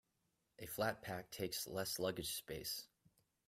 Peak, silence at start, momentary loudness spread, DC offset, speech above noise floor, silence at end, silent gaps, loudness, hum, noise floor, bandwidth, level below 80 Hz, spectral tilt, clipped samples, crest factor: -26 dBFS; 0.6 s; 8 LU; under 0.1%; 41 dB; 0.6 s; none; -44 LUFS; none; -85 dBFS; 16 kHz; -72 dBFS; -3 dB/octave; under 0.1%; 20 dB